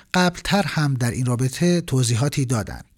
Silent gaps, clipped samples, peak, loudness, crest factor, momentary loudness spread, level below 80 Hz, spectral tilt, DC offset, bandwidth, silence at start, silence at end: none; under 0.1%; -2 dBFS; -21 LUFS; 18 dB; 3 LU; -44 dBFS; -5 dB/octave; under 0.1%; 16.5 kHz; 0.15 s; 0.15 s